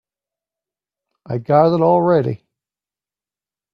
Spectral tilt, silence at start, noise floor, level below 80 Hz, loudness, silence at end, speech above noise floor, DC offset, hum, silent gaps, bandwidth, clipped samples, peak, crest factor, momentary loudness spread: -10 dB/octave; 1.3 s; under -90 dBFS; -58 dBFS; -15 LUFS; 1.4 s; over 75 dB; under 0.1%; 50 Hz at -45 dBFS; none; 5.4 kHz; under 0.1%; 0 dBFS; 20 dB; 14 LU